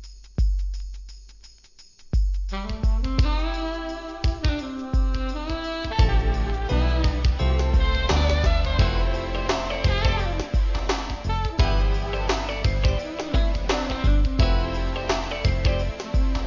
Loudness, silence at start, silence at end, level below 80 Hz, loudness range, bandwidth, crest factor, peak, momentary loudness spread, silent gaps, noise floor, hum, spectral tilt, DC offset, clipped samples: -25 LUFS; 0 s; 0 s; -24 dBFS; 5 LU; 7.4 kHz; 16 dB; -6 dBFS; 7 LU; none; -50 dBFS; none; -6 dB/octave; under 0.1%; under 0.1%